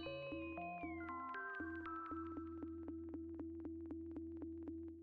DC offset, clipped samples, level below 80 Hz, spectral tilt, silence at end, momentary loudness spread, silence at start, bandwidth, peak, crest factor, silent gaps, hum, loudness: under 0.1%; under 0.1%; -66 dBFS; -5 dB/octave; 0 s; 3 LU; 0 s; 4.7 kHz; -36 dBFS; 12 dB; none; none; -49 LUFS